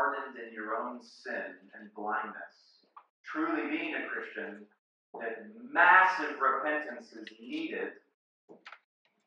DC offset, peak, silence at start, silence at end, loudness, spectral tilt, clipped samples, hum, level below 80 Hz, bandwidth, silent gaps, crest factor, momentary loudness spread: under 0.1%; -8 dBFS; 0 s; 0.5 s; -31 LUFS; -4 dB/octave; under 0.1%; none; under -90 dBFS; 9 kHz; 3.10-3.24 s, 4.79-5.13 s, 8.14-8.48 s; 24 dB; 25 LU